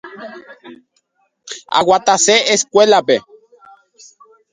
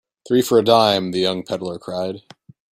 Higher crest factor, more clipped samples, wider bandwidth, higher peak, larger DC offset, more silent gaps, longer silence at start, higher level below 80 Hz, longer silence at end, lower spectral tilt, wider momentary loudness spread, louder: about the same, 16 dB vs 18 dB; neither; second, 9.6 kHz vs 16 kHz; about the same, 0 dBFS vs -2 dBFS; neither; neither; second, 0.05 s vs 0.25 s; about the same, -62 dBFS vs -60 dBFS; first, 1.3 s vs 0.55 s; second, -1.5 dB/octave vs -5 dB/octave; first, 21 LU vs 13 LU; first, -13 LUFS vs -19 LUFS